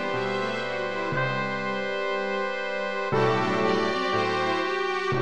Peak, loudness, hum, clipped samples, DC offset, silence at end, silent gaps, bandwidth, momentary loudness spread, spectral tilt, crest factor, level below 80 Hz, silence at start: -10 dBFS; -26 LUFS; none; under 0.1%; 0.7%; 0 s; none; 10 kHz; 5 LU; -5.5 dB/octave; 16 dB; -64 dBFS; 0 s